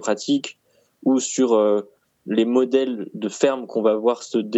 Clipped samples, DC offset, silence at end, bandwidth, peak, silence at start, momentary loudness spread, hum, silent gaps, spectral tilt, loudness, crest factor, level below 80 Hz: under 0.1%; under 0.1%; 0 s; 8.4 kHz; -4 dBFS; 0 s; 9 LU; none; none; -4.5 dB/octave; -21 LUFS; 16 dB; -76 dBFS